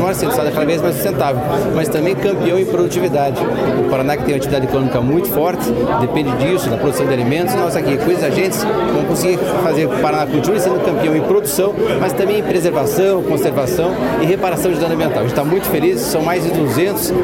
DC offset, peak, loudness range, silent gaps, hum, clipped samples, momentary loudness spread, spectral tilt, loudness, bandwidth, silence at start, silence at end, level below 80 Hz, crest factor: under 0.1%; 0 dBFS; 1 LU; none; none; under 0.1%; 2 LU; -5.5 dB/octave; -16 LUFS; 17 kHz; 0 s; 0 s; -40 dBFS; 14 dB